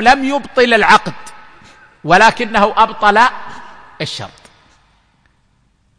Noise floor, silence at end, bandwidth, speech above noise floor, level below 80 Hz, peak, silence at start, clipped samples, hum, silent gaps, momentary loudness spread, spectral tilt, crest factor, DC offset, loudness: -57 dBFS; 1.7 s; 10.5 kHz; 45 dB; -44 dBFS; 0 dBFS; 0 s; under 0.1%; none; none; 20 LU; -4 dB/octave; 14 dB; under 0.1%; -11 LUFS